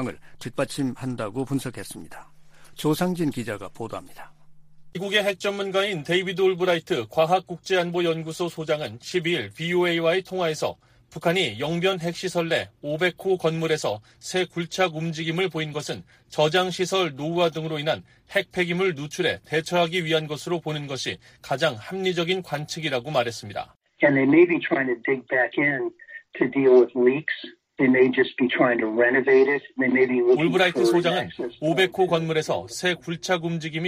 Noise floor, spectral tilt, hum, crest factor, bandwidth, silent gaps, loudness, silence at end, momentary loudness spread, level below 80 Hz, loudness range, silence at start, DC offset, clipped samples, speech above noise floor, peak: -46 dBFS; -5 dB/octave; none; 18 dB; 15.5 kHz; 23.76-23.80 s; -24 LUFS; 0 s; 12 LU; -62 dBFS; 7 LU; 0 s; under 0.1%; under 0.1%; 22 dB; -6 dBFS